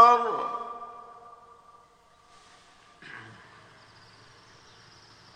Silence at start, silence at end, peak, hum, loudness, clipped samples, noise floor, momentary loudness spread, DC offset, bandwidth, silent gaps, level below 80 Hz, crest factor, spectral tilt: 0 s; 2.15 s; -4 dBFS; none; -26 LUFS; under 0.1%; -59 dBFS; 24 LU; under 0.1%; 9.8 kHz; none; -72 dBFS; 26 dB; -3.5 dB/octave